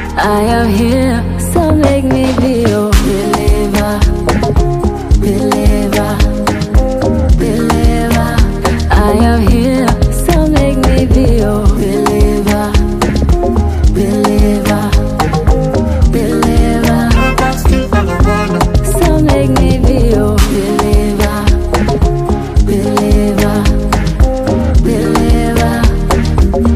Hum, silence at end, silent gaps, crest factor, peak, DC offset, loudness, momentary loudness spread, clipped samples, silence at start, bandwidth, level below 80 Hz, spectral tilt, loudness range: none; 0 s; none; 10 dB; 0 dBFS; under 0.1%; -11 LUFS; 3 LU; under 0.1%; 0 s; 15.5 kHz; -14 dBFS; -6.5 dB/octave; 1 LU